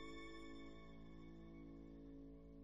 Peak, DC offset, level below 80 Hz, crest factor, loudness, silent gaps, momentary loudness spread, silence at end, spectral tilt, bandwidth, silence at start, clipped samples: -42 dBFS; under 0.1%; -64 dBFS; 14 dB; -58 LUFS; none; 5 LU; 0 s; -6 dB/octave; 9 kHz; 0 s; under 0.1%